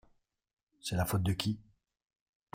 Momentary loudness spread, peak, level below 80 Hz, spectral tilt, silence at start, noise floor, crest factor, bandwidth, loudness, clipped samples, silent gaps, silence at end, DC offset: 11 LU; -14 dBFS; -58 dBFS; -5 dB/octave; 0.85 s; -71 dBFS; 22 dB; 16 kHz; -35 LUFS; under 0.1%; none; 0.95 s; under 0.1%